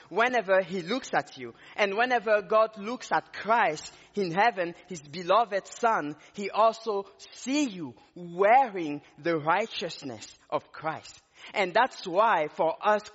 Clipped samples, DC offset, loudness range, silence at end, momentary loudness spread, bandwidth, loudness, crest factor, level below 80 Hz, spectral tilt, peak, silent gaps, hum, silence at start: under 0.1%; under 0.1%; 2 LU; 0.05 s; 16 LU; 8 kHz; -27 LUFS; 18 dB; -74 dBFS; -2.5 dB/octave; -10 dBFS; none; none; 0.1 s